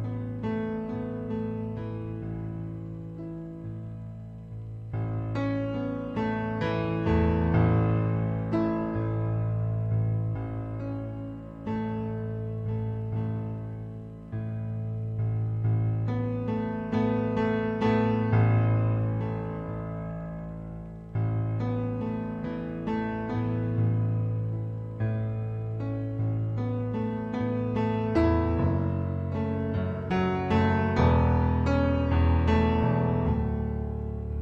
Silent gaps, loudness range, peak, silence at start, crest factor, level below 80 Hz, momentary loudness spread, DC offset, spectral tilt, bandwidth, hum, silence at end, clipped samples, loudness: none; 8 LU; -10 dBFS; 0 s; 16 dB; -40 dBFS; 13 LU; under 0.1%; -9.5 dB/octave; 5.6 kHz; none; 0 s; under 0.1%; -29 LUFS